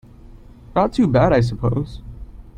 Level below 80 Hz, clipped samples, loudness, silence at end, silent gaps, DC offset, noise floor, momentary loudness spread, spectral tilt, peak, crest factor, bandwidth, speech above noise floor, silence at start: -36 dBFS; under 0.1%; -18 LUFS; 0.1 s; none; under 0.1%; -42 dBFS; 19 LU; -8.5 dB/octave; -2 dBFS; 18 dB; 9.6 kHz; 25 dB; 0.7 s